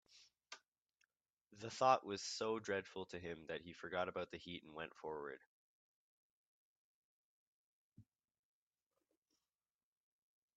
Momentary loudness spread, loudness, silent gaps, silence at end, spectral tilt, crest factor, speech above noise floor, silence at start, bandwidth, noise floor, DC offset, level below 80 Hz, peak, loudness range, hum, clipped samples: 21 LU; -44 LUFS; 0.68-0.72 s, 0.82-0.86 s, 1.33-1.45 s, 5.46-7.92 s; 2.55 s; -3.5 dB/octave; 28 dB; over 47 dB; 0.15 s; 8.8 kHz; under -90 dBFS; under 0.1%; -84 dBFS; -20 dBFS; 14 LU; none; under 0.1%